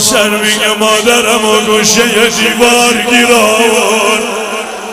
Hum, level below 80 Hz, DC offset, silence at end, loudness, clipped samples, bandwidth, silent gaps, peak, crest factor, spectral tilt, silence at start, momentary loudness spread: none; -44 dBFS; under 0.1%; 0 s; -8 LUFS; 0.8%; 16.5 kHz; none; 0 dBFS; 10 dB; -1.5 dB/octave; 0 s; 5 LU